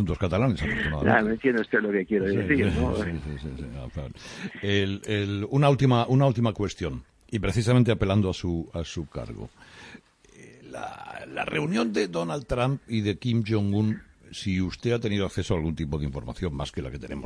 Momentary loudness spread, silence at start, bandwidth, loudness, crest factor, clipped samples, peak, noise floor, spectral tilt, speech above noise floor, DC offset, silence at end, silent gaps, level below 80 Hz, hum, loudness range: 15 LU; 0 s; 11 kHz; -26 LUFS; 20 dB; under 0.1%; -6 dBFS; -51 dBFS; -6.5 dB/octave; 25 dB; under 0.1%; 0 s; none; -42 dBFS; none; 7 LU